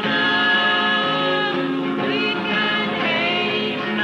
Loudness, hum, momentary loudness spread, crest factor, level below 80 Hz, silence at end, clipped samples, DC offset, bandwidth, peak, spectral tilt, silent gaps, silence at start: -19 LUFS; none; 6 LU; 12 dB; -60 dBFS; 0 s; under 0.1%; under 0.1%; 9.6 kHz; -8 dBFS; -5 dB/octave; none; 0 s